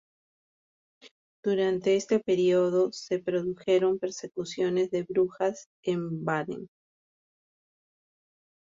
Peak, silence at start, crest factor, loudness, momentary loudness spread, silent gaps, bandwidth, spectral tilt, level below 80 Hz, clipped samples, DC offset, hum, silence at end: -14 dBFS; 1.05 s; 16 dB; -28 LUFS; 10 LU; 1.11-1.43 s, 5.66-5.83 s; 7.6 kHz; -6 dB/octave; -72 dBFS; under 0.1%; under 0.1%; none; 2.05 s